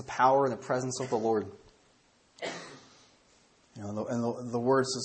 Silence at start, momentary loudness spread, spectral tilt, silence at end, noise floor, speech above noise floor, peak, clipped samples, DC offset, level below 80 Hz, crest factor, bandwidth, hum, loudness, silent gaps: 0 s; 18 LU; -5 dB/octave; 0 s; -65 dBFS; 37 dB; -10 dBFS; under 0.1%; under 0.1%; -72 dBFS; 20 dB; 8.8 kHz; none; -30 LUFS; none